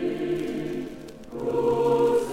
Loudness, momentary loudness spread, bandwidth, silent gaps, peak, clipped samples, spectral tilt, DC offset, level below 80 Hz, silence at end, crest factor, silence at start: -25 LUFS; 17 LU; 15.5 kHz; none; -12 dBFS; under 0.1%; -6.5 dB/octave; under 0.1%; -54 dBFS; 0 s; 14 dB; 0 s